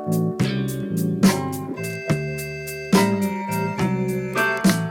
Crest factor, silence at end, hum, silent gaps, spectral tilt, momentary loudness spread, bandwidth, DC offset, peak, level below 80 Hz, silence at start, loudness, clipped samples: 16 dB; 0 s; none; none; -5.5 dB/octave; 9 LU; 18 kHz; under 0.1%; -6 dBFS; -52 dBFS; 0 s; -22 LUFS; under 0.1%